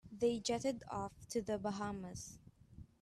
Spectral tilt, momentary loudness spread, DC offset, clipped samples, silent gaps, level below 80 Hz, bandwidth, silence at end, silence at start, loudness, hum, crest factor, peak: -4.5 dB/octave; 19 LU; under 0.1%; under 0.1%; none; -66 dBFS; 13.5 kHz; 0.15 s; 0.05 s; -41 LUFS; none; 18 dB; -24 dBFS